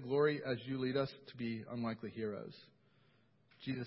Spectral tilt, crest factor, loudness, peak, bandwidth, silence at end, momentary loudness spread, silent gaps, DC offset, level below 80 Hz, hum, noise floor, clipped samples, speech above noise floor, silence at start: -5.5 dB/octave; 20 dB; -40 LUFS; -20 dBFS; 5.6 kHz; 0 s; 15 LU; none; under 0.1%; -76 dBFS; none; -72 dBFS; under 0.1%; 33 dB; 0 s